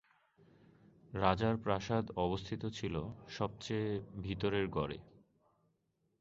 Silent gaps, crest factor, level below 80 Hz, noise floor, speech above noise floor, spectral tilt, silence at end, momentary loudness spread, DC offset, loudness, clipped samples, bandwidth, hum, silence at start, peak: none; 24 dB; -58 dBFS; -80 dBFS; 43 dB; -5.5 dB/octave; 1.15 s; 9 LU; under 0.1%; -37 LUFS; under 0.1%; 7.6 kHz; none; 1.05 s; -14 dBFS